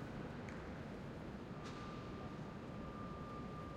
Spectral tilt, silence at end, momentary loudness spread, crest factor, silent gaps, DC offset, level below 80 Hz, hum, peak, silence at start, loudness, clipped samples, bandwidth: -7 dB/octave; 0 s; 1 LU; 14 dB; none; under 0.1%; -60 dBFS; none; -36 dBFS; 0 s; -49 LUFS; under 0.1%; 15.5 kHz